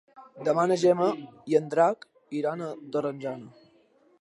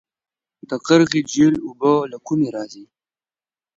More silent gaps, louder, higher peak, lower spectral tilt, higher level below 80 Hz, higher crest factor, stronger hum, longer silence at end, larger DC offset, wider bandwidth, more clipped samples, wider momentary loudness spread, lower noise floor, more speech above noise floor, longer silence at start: neither; second, -27 LUFS vs -18 LUFS; second, -10 dBFS vs 0 dBFS; about the same, -6 dB/octave vs -5.5 dB/octave; second, -80 dBFS vs -60 dBFS; about the same, 18 dB vs 20 dB; neither; second, 0.7 s vs 0.95 s; neither; first, 11.5 kHz vs 7.8 kHz; neither; about the same, 14 LU vs 14 LU; second, -62 dBFS vs under -90 dBFS; second, 36 dB vs over 72 dB; second, 0.15 s vs 0.7 s